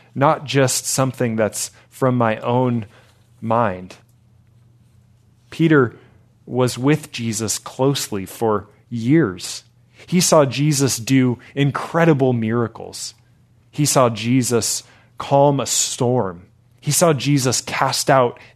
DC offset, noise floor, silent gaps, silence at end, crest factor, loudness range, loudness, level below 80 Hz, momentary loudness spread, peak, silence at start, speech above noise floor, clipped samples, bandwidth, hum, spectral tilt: under 0.1%; -54 dBFS; none; 0.2 s; 20 dB; 5 LU; -18 LUFS; -62 dBFS; 13 LU; 0 dBFS; 0.15 s; 36 dB; under 0.1%; 14 kHz; none; -4.5 dB/octave